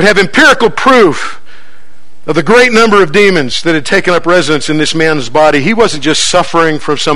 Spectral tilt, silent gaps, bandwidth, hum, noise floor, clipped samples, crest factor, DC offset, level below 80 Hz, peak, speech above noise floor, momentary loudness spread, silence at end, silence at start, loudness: -4 dB/octave; none; 14.5 kHz; none; -46 dBFS; 3%; 10 dB; 10%; -40 dBFS; 0 dBFS; 38 dB; 6 LU; 0 s; 0 s; -8 LUFS